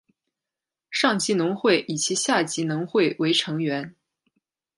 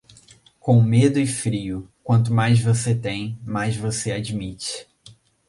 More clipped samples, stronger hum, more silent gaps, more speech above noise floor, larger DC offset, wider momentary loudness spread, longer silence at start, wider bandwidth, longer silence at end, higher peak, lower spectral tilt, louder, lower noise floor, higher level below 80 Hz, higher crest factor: neither; neither; neither; first, 65 dB vs 32 dB; neither; second, 7 LU vs 13 LU; first, 0.9 s vs 0.65 s; about the same, 11.5 kHz vs 11.5 kHz; first, 0.9 s vs 0.35 s; about the same, -6 dBFS vs -4 dBFS; second, -3.5 dB/octave vs -6 dB/octave; about the same, -23 LUFS vs -21 LUFS; first, -89 dBFS vs -52 dBFS; second, -74 dBFS vs -50 dBFS; about the same, 20 dB vs 16 dB